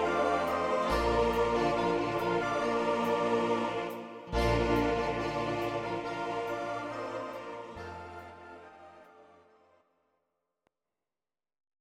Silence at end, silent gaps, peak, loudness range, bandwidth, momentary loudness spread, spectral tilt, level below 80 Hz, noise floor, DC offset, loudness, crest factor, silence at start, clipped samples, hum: 2.55 s; none; -16 dBFS; 17 LU; 16 kHz; 15 LU; -6 dB/octave; -48 dBFS; under -90 dBFS; under 0.1%; -31 LUFS; 16 dB; 0 s; under 0.1%; none